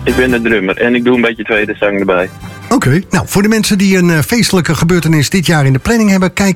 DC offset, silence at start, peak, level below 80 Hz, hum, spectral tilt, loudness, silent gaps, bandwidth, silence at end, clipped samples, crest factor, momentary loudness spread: under 0.1%; 0 s; 0 dBFS; -34 dBFS; none; -5.5 dB/octave; -11 LUFS; none; 17 kHz; 0 s; under 0.1%; 10 dB; 4 LU